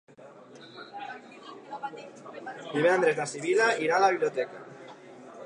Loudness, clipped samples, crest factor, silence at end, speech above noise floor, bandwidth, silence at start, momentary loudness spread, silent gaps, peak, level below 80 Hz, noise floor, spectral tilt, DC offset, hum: -26 LUFS; under 0.1%; 18 dB; 0 s; 25 dB; 11 kHz; 0.2 s; 23 LU; none; -12 dBFS; -86 dBFS; -50 dBFS; -4 dB/octave; under 0.1%; none